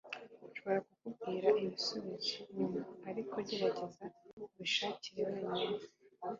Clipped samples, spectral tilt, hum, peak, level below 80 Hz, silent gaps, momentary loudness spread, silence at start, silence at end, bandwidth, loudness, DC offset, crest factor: under 0.1%; -2.5 dB/octave; none; -18 dBFS; -80 dBFS; 4.33-4.37 s; 16 LU; 0.05 s; 0 s; 7.4 kHz; -39 LUFS; under 0.1%; 20 dB